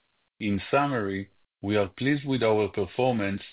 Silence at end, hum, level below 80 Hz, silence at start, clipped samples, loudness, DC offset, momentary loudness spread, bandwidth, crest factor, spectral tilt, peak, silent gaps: 0 s; none; -54 dBFS; 0.4 s; under 0.1%; -27 LUFS; under 0.1%; 9 LU; 4 kHz; 16 dB; -10.5 dB/octave; -10 dBFS; none